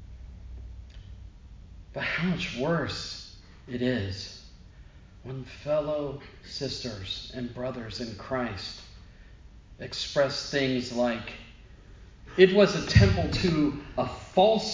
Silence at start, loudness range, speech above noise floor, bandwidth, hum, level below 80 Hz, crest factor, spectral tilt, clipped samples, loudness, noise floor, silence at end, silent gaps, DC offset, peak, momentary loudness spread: 0 s; 10 LU; 23 dB; 7.6 kHz; none; -44 dBFS; 24 dB; -6 dB/octave; under 0.1%; -27 LUFS; -50 dBFS; 0 s; none; under 0.1%; -4 dBFS; 24 LU